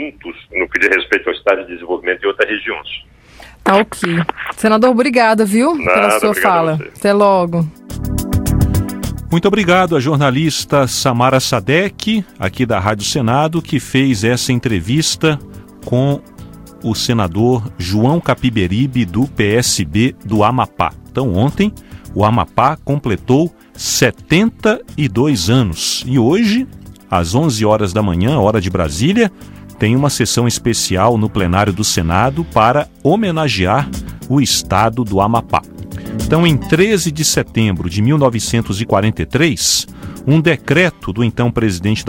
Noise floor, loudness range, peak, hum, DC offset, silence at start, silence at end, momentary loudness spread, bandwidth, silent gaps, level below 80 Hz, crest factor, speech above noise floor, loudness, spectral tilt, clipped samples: -40 dBFS; 3 LU; 0 dBFS; none; under 0.1%; 0 s; 0 s; 7 LU; 17 kHz; none; -34 dBFS; 14 dB; 26 dB; -14 LUFS; -5 dB/octave; under 0.1%